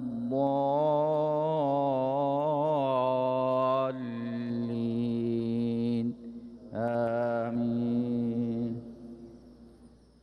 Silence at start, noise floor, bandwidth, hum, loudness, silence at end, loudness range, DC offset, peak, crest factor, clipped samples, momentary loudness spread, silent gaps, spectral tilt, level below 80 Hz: 0 s; -56 dBFS; 5.6 kHz; none; -29 LUFS; 0.35 s; 4 LU; under 0.1%; -16 dBFS; 14 dB; under 0.1%; 9 LU; none; -9.5 dB/octave; -66 dBFS